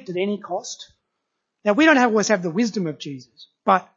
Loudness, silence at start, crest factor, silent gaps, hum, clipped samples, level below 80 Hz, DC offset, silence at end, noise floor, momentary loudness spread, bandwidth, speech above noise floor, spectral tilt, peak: -20 LUFS; 0.1 s; 20 dB; none; none; under 0.1%; -76 dBFS; under 0.1%; 0.15 s; -78 dBFS; 19 LU; 7.8 kHz; 57 dB; -4.5 dB/octave; -2 dBFS